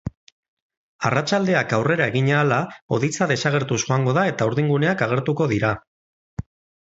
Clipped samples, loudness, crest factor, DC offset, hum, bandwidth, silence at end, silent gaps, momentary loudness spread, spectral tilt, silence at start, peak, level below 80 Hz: under 0.1%; -21 LUFS; 18 dB; under 0.1%; none; 8 kHz; 0.45 s; 0.17-0.70 s, 0.77-0.99 s, 2.82-2.89 s, 5.87-6.37 s; 10 LU; -5.5 dB/octave; 0.05 s; -4 dBFS; -50 dBFS